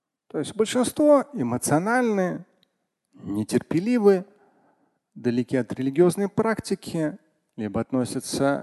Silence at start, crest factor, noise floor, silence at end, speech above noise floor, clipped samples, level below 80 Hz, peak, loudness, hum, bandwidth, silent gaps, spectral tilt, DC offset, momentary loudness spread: 0.35 s; 18 dB; -75 dBFS; 0 s; 52 dB; under 0.1%; -58 dBFS; -6 dBFS; -24 LUFS; none; 12.5 kHz; none; -5.5 dB/octave; under 0.1%; 11 LU